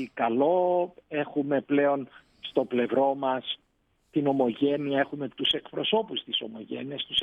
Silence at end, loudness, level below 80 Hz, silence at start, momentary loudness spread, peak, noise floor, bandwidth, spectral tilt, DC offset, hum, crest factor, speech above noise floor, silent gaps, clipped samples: 0 s; -27 LUFS; -72 dBFS; 0 s; 10 LU; -10 dBFS; -70 dBFS; 5.2 kHz; -6.5 dB/octave; under 0.1%; none; 18 dB; 43 dB; none; under 0.1%